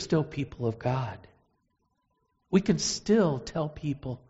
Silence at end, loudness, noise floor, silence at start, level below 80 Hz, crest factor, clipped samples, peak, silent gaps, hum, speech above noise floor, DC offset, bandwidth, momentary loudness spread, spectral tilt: 0.15 s; -29 LUFS; -75 dBFS; 0 s; -54 dBFS; 18 dB; under 0.1%; -12 dBFS; none; none; 47 dB; under 0.1%; 8 kHz; 10 LU; -6 dB/octave